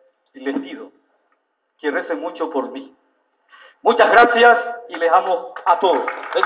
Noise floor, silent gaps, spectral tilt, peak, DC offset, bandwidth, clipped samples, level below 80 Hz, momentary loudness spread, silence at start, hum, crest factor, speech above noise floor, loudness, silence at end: -68 dBFS; none; -6.5 dB/octave; 0 dBFS; under 0.1%; 4 kHz; under 0.1%; -66 dBFS; 18 LU; 0.35 s; none; 18 dB; 51 dB; -17 LUFS; 0 s